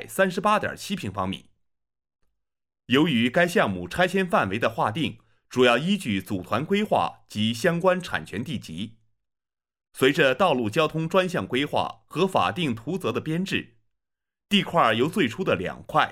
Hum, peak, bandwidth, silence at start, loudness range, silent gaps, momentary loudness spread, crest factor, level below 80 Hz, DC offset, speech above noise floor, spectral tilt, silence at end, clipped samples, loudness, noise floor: none; -4 dBFS; 16 kHz; 0 s; 3 LU; none; 11 LU; 20 dB; -60 dBFS; under 0.1%; 65 dB; -5.5 dB/octave; 0 s; under 0.1%; -24 LUFS; -88 dBFS